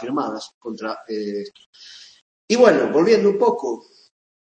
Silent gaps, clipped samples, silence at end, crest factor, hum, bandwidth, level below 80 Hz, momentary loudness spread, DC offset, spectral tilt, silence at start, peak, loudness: 0.54-0.61 s, 1.66-1.73 s, 2.22-2.48 s; under 0.1%; 0.65 s; 20 dB; none; 8.6 kHz; -68 dBFS; 19 LU; under 0.1%; -5 dB/octave; 0 s; -2 dBFS; -19 LUFS